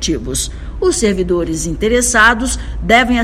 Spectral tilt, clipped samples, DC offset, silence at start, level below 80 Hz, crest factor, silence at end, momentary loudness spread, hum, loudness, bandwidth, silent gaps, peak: -3.5 dB/octave; 0.3%; under 0.1%; 0 s; -26 dBFS; 14 dB; 0 s; 10 LU; none; -14 LUFS; 16 kHz; none; 0 dBFS